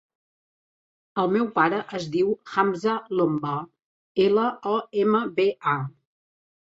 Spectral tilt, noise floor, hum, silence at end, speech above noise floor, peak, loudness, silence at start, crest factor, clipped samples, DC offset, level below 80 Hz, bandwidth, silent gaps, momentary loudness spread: -7 dB/octave; under -90 dBFS; none; 0.75 s; over 67 dB; -6 dBFS; -24 LUFS; 1.15 s; 18 dB; under 0.1%; under 0.1%; -68 dBFS; 7.8 kHz; 3.84-4.15 s; 9 LU